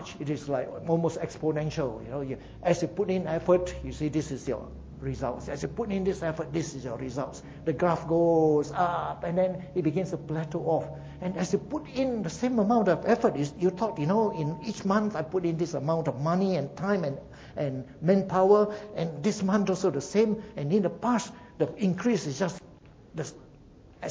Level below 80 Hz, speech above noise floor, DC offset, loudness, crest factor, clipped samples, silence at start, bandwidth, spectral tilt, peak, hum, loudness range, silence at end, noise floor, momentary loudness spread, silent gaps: -52 dBFS; 25 dB; under 0.1%; -28 LUFS; 20 dB; under 0.1%; 0 s; 8 kHz; -7 dB/octave; -8 dBFS; none; 4 LU; 0 s; -52 dBFS; 11 LU; none